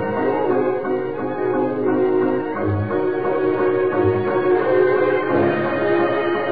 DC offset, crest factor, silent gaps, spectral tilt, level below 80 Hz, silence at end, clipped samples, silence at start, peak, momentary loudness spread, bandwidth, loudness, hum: 0.9%; 12 dB; none; -11 dB/octave; -56 dBFS; 0 s; under 0.1%; 0 s; -6 dBFS; 5 LU; 4.9 kHz; -19 LUFS; none